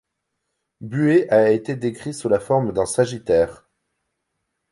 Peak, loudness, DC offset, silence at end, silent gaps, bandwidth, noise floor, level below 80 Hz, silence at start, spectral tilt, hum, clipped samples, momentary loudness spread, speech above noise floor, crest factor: -4 dBFS; -20 LUFS; under 0.1%; 1.15 s; none; 11.5 kHz; -77 dBFS; -52 dBFS; 0.8 s; -6.5 dB/octave; none; under 0.1%; 11 LU; 58 dB; 18 dB